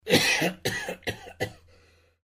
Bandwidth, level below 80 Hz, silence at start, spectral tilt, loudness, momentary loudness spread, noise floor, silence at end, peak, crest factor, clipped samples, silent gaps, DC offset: 15.5 kHz; -56 dBFS; 0.05 s; -3 dB/octave; -27 LUFS; 14 LU; -60 dBFS; 0.7 s; -8 dBFS; 22 dB; under 0.1%; none; under 0.1%